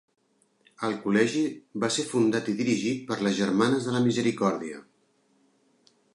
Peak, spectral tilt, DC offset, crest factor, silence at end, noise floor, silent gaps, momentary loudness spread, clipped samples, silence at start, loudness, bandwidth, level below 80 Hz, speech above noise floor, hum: -8 dBFS; -5 dB/octave; under 0.1%; 20 dB; 1.3 s; -67 dBFS; none; 8 LU; under 0.1%; 0.8 s; -26 LUFS; 11.5 kHz; -72 dBFS; 41 dB; none